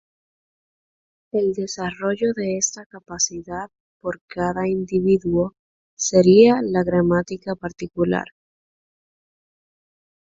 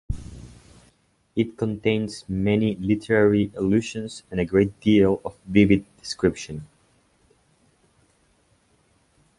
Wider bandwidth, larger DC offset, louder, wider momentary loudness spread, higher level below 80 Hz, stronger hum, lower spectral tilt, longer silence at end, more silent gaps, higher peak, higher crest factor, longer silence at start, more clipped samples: second, 7.8 kHz vs 11.5 kHz; neither; first, -20 LUFS vs -23 LUFS; about the same, 17 LU vs 15 LU; second, -52 dBFS vs -46 dBFS; neither; second, -5 dB/octave vs -6.5 dB/octave; second, 2.05 s vs 2.75 s; first, 2.86-2.90 s, 3.80-4.00 s, 4.21-4.28 s, 5.59-5.97 s vs none; about the same, -2 dBFS vs -4 dBFS; about the same, 20 dB vs 20 dB; first, 1.35 s vs 0.1 s; neither